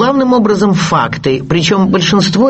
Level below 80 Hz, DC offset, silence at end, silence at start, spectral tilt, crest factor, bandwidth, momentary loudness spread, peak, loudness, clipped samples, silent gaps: -40 dBFS; under 0.1%; 0 s; 0 s; -5.5 dB/octave; 10 dB; 8.4 kHz; 3 LU; 0 dBFS; -11 LUFS; under 0.1%; none